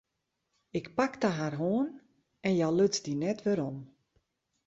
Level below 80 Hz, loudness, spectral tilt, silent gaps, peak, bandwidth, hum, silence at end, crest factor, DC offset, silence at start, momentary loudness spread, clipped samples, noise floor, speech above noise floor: -70 dBFS; -31 LUFS; -5.5 dB/octave; none; -14 dBFS; 8 kHz; none; 0.8 s; 18 dB; under 0.1%; 0.75 s; 11 LU; under 0.1%; -83 dBFS; 53 dB